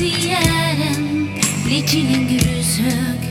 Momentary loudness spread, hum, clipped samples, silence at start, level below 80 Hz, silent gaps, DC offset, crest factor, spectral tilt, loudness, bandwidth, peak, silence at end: 3 LU; none; under 0.1%; 0 s; -36 dBFS; none; under 0.1%; 16 dB; -4 dB/octave; -17 LUFS; 18 kHz; 0 dBFS; 0 s